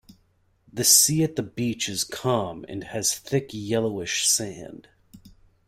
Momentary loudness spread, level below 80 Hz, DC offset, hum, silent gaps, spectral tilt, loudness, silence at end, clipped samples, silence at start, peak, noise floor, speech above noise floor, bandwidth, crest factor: 19 LU; -58 dBFS; under 0.1%; none; none; -2.5 dB/octave; -22 LUFS; 0.4 s; under 0.1%; 0.1 s; -4 dBFS; -65 dBFS; 40 dB; 16 kHz; 22 dB